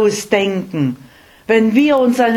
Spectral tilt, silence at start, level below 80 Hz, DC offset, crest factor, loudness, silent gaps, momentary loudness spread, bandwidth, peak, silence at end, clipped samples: -5.5 dB/octave; 0 s; -54 dBFS; under 0.1%; 14 dB; -15 LUFS; none; 12 LU; 17.5 kHz; 0 dBFS; 0 s; under 0.1%